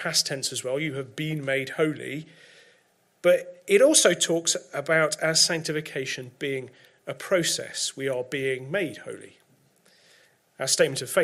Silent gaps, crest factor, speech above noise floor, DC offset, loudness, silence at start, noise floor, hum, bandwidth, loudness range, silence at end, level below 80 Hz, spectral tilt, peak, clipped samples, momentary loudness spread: none; 22 dB; 39 dB; under 0.1%; -24 LUFS; 0 s; -65 dBFS; none; 16 kHz; 7 LU; 0 s; -74 dBFS; -2.5 dB/octave; -4 dBFS; under 0.1%; 14 LU